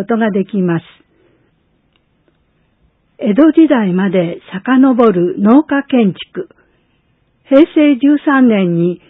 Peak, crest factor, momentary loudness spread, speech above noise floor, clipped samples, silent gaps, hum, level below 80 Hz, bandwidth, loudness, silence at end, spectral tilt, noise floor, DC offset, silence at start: 0 dBFS; 12 dB; 12 LU; 47 dB; 0.1%; none; none; -58 dBFS; 4 kHz; -11 LUFS; 0.15 s; -10.5 dB/octave; -58 dBFS; under 0.1%; 0 s